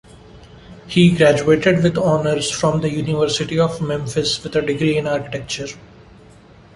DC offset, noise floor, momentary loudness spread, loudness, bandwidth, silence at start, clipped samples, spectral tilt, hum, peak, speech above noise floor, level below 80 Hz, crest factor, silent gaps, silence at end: under 0.1%; -45 dBFS; 10 LU; -18 LUFS; 11.5 kHz; 0.35 s; under 0.1%; -5.5 dB/octave; none; -2 dBFS; 28 dB; -46 dBFS; 18 dB; none; 0.9 s